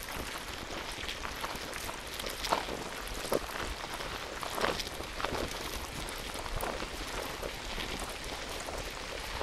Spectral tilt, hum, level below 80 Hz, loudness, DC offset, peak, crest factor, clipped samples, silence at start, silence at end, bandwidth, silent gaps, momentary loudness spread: -2.5 dB/octave; none; -46 dBFS; -37 LUFS; under 0.1%; -10 dBFS; 28 dB; under 0.1%; 0 s; 0 s; 16 kHz; none; 6 LU